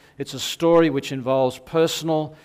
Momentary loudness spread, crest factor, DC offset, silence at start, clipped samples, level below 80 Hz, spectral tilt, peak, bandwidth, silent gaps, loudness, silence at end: 10 LU; 16 dB; under 0.1%; 0.2 s; under 0.1%; -58 dBFS; -5 dB/octave; -6 dBFS; 16 kHz; none; -21 LUFS; 0.1 s